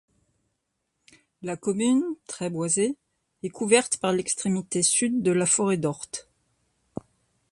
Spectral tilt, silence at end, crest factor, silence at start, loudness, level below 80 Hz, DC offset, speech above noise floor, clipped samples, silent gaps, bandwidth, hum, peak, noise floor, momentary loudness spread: -4 dB/octave; 1.3 s; 22 dB; 1.4 s; -24 LUFS; -66 dBFS; under 0.1%; 54 dB; under 0.1%; none; 11.5 kHz; none; -6 dBFS; -78 dBFS; 17 LU